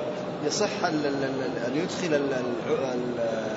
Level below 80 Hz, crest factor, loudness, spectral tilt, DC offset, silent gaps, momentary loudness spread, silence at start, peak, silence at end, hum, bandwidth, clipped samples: -64 dBFS; 16 dB; -28 LUFS; -4.5 dB/octave; under 0.1%; none; 3 LU; 0 s; -10 dBFS; 0 s; none; 8 kHz; under 0.1%